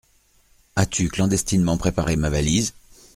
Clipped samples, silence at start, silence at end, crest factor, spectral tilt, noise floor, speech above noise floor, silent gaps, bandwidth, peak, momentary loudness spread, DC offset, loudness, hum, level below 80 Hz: under 0.1%; 0.75 s; 0.45 s; 20 dB; -5 dB/octave; -59 dBFS; 38 dB; none; 16 kHz; -2 dBFS; 4 LU; under 0.1%; -22 LUFS; none; -36 dBFS